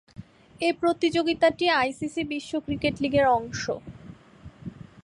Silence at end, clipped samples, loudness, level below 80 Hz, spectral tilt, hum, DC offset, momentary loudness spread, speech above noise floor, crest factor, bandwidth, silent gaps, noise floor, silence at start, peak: 0.25 s; under 0.1%; -25 LUFS; -54 dBFS; -5 dB/octave; none; under 0.1%; 20 LU; 24 dB; 16 dB; 11 kHz; none; -48 dBFS; 0.2 s; -10 dBFS